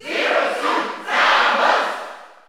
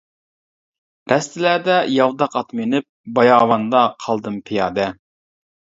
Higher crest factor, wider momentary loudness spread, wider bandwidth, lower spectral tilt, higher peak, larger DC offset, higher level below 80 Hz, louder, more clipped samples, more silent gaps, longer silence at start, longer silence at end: about the same, 16 dB vs 18 dB; about the same, 11 LU vs 10 LU; first, over 20 kHz vs 8 kHz; second, -1 dB/octave vs -5 dB/octave; about the same, -2 dBFS vs 0 dBFS; neither; second, -74 dBFS vs -60 dBFS; about the same, -17 LUFS vs -18 LUFS; neither; second, none vs 2.89-3.04 s; second, 0 s vs 1.1 s; second, 0.2 s vs 0.75 s